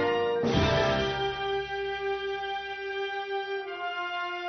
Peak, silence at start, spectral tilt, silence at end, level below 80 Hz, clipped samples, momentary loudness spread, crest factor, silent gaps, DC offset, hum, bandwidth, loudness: -12 dBFS; 0 s; -5.5 dB/octave; 0 s; -48 dBFS; under 0.1%; 9 LU; 18 dB; none; under 0.1%; none; 6.4 kHz; -30 LUFS